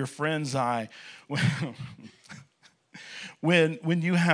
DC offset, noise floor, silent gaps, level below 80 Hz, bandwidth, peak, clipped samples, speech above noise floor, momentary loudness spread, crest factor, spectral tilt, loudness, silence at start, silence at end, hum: under 0.1%; -55 dBFS; none; -70 dBFS; 10.5 kHz; -4 dBFS; under 0.1%; 28 dB; 24 LU; 24 dB; -6 dB/octave; -27 LUFS; 0 s; 0 s; none